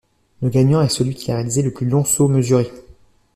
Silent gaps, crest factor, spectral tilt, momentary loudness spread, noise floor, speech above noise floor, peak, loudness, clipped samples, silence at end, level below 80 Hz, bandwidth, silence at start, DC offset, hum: none; 14 dB; -6 dB/octave; 7 LU; -49 dBFS; 32 dB; -4 dBFS; -18 LUFS; under 0.1%; 0.55 s; -48 dBFS; 14.5 kHz; 0.4 s; under 0.1%; none